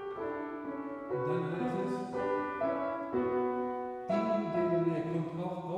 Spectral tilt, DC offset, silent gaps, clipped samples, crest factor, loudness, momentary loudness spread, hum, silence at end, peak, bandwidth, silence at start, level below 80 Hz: -8.5 dB/octave; under 0.1%; none; under 0.1%; 14 dB; -34 LUFS; 7 LU; none; 0 s; -20 dBFS; 9.6 kHz; 0 s; -70 dBFS